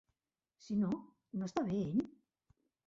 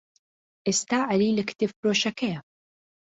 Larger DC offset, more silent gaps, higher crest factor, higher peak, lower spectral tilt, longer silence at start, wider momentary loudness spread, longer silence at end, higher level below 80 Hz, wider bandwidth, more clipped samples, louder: neither; second, none vs 1.76-1.83 s; about the same, 16 dB vs 16 dB; second, -22 dBFS vs -12 dBFS; first, -8 dB/octave vs -3.5 dB/octave; about the same, 0.65 s vs 0.65 s; about the same, 9 LU vs 8 LU; about the same, 0.8 s vs 0.75 s; about the same, -70 dBFS vs -66 dBFS; about the same, 7.6 kHz vs 8.2 kHz; neither; second, -38 LUFS vs -25 LUFS